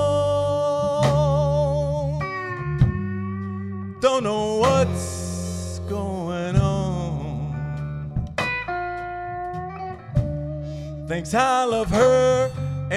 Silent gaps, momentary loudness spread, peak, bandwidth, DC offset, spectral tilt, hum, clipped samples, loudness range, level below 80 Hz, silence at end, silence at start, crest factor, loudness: none; 11 LU; -4 dBFS; 12.5 kHz; under 0.1%; -6 dB/octave; none; under 0.1%; 6 LU; -38 dBFS; 0 s; 0 s; 18 dB; -23 LUFS